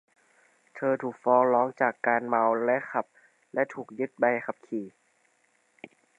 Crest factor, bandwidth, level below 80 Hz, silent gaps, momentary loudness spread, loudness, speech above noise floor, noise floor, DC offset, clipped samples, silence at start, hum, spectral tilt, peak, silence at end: 22 dB; 9.8 kHz; -84 dBFS; none; 12 LU; -27 LUFS; 42 dB; -69 dBFS; under 0.1%; under 0.1%; 0.75 s; none; -8 dB/octave; -8 dBFS; 1.3 s